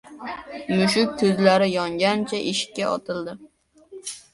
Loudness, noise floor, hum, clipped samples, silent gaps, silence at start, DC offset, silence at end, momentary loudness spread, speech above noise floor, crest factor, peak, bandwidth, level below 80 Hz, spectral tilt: -22 LUFS; -45 dBFS; none; under 0.1%; none; 0.05 s; under 0.1%; 0.15 s; 17 LU; 23 dB; 20 dB; -4 dBFS; 11.5 kHz; -60 dBFS; -4.5 dB/octave